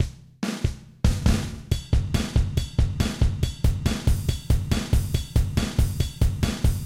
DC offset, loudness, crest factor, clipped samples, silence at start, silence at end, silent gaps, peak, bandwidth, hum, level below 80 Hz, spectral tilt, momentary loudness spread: 0.2%; -25 LUFS; 16 dB; under 0.1%; 0 s; 0 s; none; -8 dBFS; 16.5 kHz; none; -26 dBFS; -6 dB/octave; 4 LU